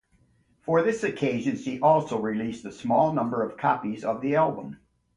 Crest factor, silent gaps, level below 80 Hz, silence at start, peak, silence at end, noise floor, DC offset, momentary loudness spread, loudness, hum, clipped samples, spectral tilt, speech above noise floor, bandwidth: 18 dB; none; -62 dBFS; 0.65 s; -8 dBFS; 0.4 s; -64 dBFS; under 0.1%; 11 LU; -26 LUFS; none; under 0.1%; -7 dB/octave; 39 dB; 11 kHz